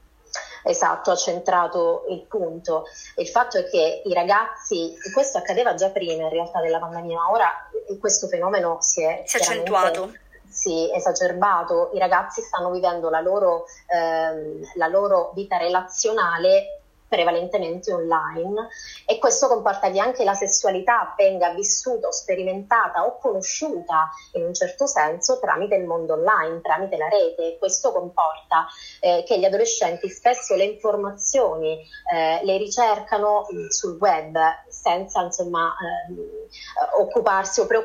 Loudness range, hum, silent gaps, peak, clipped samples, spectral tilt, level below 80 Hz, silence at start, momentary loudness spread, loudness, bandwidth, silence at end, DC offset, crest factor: 2 LU; none; none; -4 dBFS; under 0.1%; -2 dB/octave; -60 dBFS; 0.35 s; 8 LU; -22 LUFS; 16 kHz; 0 s; under 0.1%; 18 dB